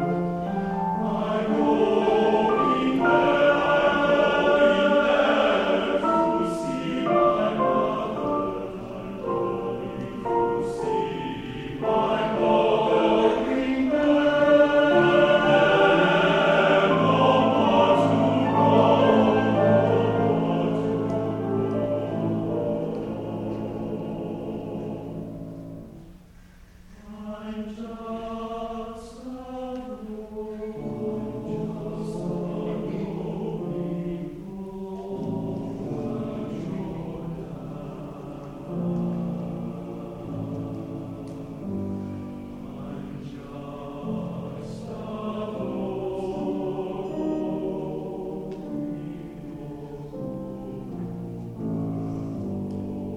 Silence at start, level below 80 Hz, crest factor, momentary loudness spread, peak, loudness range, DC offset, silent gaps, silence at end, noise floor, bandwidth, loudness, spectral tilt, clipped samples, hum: 0 s; -50 dBFS; 18 dB; 17 LU; -6 dBFS; 15 LU; under 0.1%; none; 0 s; -49 dBFS; 10.5 kHz; -24 LUFS; -7 dB/octave; under 0.1%; none